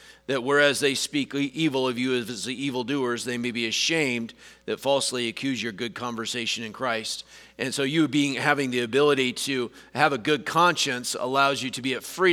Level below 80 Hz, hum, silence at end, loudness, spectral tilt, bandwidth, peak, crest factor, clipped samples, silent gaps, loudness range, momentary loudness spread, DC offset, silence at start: -68 dBFS; none; 0 s; -25 LUFS; -3.5 dB/octave; 18.5 kHz; -4 dBFS; 22 dB; under 0.1%; none; 5 LU; 10 LU; under 0.1%; 0.05 s